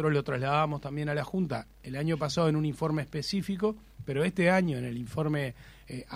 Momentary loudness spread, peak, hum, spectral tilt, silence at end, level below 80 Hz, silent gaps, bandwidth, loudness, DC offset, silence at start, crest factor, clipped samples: 10 LU; -12 dBFS; none; -6.5 dB/octave; 0 s; -56 dBFS; none; 16 kHz; -30 LUFS; under 0.1%; 0 s; 18 dB; under 0.1%